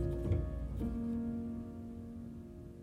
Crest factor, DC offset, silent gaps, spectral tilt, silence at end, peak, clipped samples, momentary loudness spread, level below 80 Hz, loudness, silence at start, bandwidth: 16 dB; under 0.1%; none; -10 dB/octave; 0 s; -24 dBFS; under 0.1%; 12 LU; -46 dBFS; -40 LUFS; 0 s; 12.5 kHz